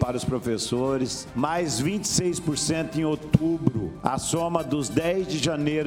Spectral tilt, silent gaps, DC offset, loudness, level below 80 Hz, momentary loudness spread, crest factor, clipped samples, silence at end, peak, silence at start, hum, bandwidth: -5 dB/octave; none; under 0.1%; -25 LUFS; -48 dBFS; 4 LU; 22 dB; under 0.1%; 0 s; -2 dBFS; 0 s; none; 17 kHz